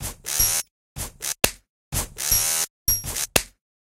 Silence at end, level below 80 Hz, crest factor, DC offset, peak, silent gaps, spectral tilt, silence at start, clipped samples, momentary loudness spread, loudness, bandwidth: 0.35 s; -40 dBFS; 26 dB; under 0.1%; 0 dBFS; 0.71-0.96 s, 1.70-1.91 s, 2.70-2.86 s; -1 dB/octave; 0 s; under 0.1%; 14 LU; -22 LUFS; 17 kHz